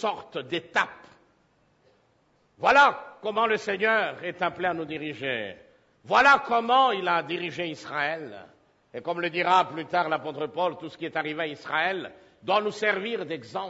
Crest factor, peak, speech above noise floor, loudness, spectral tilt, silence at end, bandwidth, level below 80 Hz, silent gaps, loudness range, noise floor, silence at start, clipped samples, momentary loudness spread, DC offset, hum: 20 dB; -8 dBFS; 40 dB; -25 LUFS; -4 dB/octave; 0 s; 8 kHz; -68 dBFS; none; 4 LU; -66 dBFS; 0 s; under 0.1%; 14 LU; under 0.1%; none